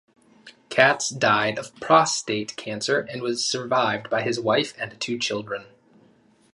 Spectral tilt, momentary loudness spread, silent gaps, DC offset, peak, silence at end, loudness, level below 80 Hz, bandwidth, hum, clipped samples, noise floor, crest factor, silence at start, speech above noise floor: -3 dB/octave; 12 LU; none; under 0.1%; 0 dBFS; 0.9 s; -23 LUFS; -66 dBFS; 11.5 kHz; none; under 0.1%; -58 dBFS; 24 dB; 0.45 s; 35 dB